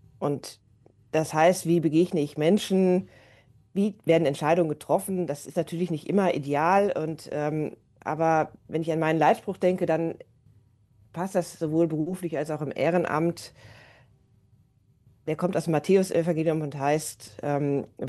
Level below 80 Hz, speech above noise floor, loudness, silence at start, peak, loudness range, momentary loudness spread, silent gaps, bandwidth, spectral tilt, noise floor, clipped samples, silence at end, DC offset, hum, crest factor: -66 dBFS; 37 dB; -26 LUFS; 0.2 s; -8 dBFS; 4 LU; 11 LU; none; 12.5 kHz; -6.5 dB/octave; -62 dBFS; under 0.1%; 0 s; under 0.1%; none; 18 dB